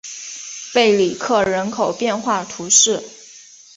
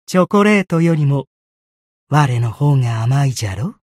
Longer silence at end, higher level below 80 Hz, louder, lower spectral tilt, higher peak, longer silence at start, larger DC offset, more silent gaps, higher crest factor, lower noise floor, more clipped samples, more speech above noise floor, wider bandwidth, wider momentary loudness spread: first, 0.35 s vs 0.2 s; second, -58 dBFS vs -52 dBFS; about the same, -17 LUFS vs -16 LUFS; second, -2 dB/octave vs -7 dB/octave; about the same, 0 dBFS vs -2 dBFS; about the same, 0.05 s vs 0.1 s; neither; second, none vs 1.27-2.07 s; about the same, 18 dB vs 14 dB; second, -43 dBFS vs under -90 dBFS; neither; second, 26 dB vs over 76 dB; second, 8 kHz vs 13.5 kHz; first, 17 LU vs 9 LU